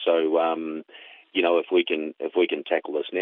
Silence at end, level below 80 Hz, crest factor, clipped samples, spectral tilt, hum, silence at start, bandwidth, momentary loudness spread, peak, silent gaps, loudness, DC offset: 0 s; -82 dBFS; 16 dB; under 0.1%; -1 dB/octave; none; 0 s; 4.1 kHz; 10 LU; -8 dBFS; none; -24 LUFS; under 0.1%